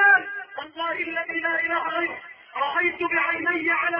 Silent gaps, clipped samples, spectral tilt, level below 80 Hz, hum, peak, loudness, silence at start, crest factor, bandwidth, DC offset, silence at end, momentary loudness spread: none; under 0.1%; -6 dB/octave; -68 dBFS; none; -8 dBFS; -24 LUFS; 0 s; 18 dB; 5.8 kHz; under 0.1%; 0 s; 12 LU